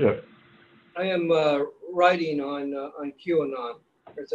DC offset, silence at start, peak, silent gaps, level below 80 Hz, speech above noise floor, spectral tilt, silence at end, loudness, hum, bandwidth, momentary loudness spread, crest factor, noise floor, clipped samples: under 0.1%; 0 s; -6 dBFS; none; -64 dBFS; 31 dB; -6.5 dB/octave; 0 s; -26 LUFS; none; 7.8 kHz; 17 LU; 22 dB; -56 dBFS; under 0.1%